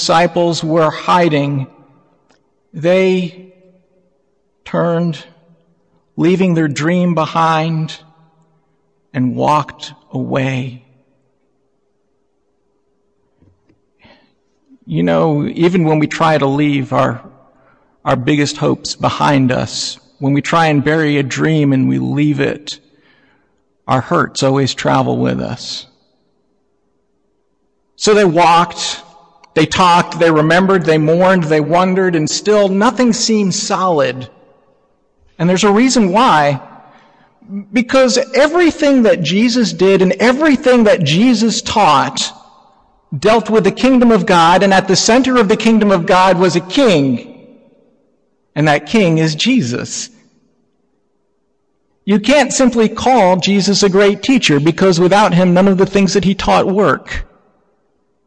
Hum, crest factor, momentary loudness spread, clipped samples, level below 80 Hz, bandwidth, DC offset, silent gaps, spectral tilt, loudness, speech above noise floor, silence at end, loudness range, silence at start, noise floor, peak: none; 14 dB; 11 LU; under 0.1%; -44 dBFS; 10.5 kHz; under 0.1%; none; -5 dB/octave; -12 LUFS; 52 dB; 1 s; 8 LU; 0 s; -64 dBFS; 0 dBFS